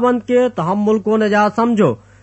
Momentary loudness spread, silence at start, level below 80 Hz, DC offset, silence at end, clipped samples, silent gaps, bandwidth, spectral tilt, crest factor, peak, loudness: 3 LU; 0 s; -56 dBFS; under 0.1%; 0.25 s; under 0.1%; none; 8.4 kHz; -7 dB/octave; 12 dB; -2 dBFS; -15 LUFS